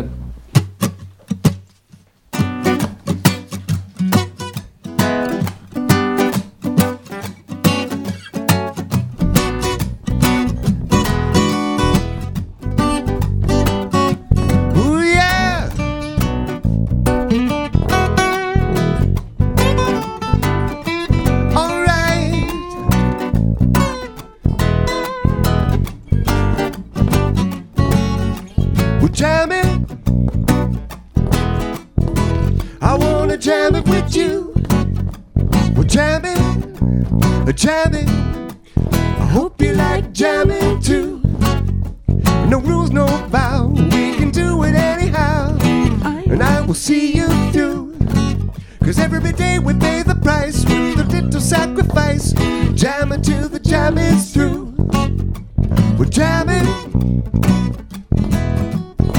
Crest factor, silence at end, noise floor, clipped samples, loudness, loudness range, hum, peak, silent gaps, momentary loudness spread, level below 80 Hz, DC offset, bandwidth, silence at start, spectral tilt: 16 dB; 0 s; -48 dBFS; under 0.1%; -17 LUFS; 3 LU; none; 0 dBFS; none; 7 LU; -24 dBFS; under 0.1%; 18 kHz; 0 s; -6 dB/octave